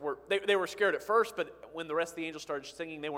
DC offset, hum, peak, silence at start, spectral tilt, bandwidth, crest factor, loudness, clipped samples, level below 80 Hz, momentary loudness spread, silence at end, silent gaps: under 0.1%; none; -14 dBFS; 0 s; -3.5 dB/octave; 16.5 kHz; 18 dB; -32 LUFS; under 0.1%; -72 dBFS; 11 LU; 0 s; none